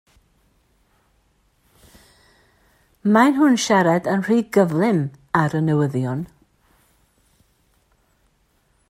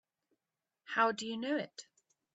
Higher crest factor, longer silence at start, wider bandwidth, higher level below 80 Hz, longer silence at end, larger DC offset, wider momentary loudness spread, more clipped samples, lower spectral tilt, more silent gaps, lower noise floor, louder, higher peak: about the same, 20 dB vs 22 dB; first, 3.05 s vs 0.9 s; first, 16 kHz vs 8.2 kHz; first, -60 dBFS vs -86 dBFS; first, 2.65 s vs 0.55 s; neither; second, 10 LU vs 14 LU; neither; first, -6 dB/octave vs -3.5 dB/octave; neither; second, -63 dBFS vs under -90 dBFS; first, -19 LUFS vs -35 LUFS; first, -2 dBFS vs -16 dBFS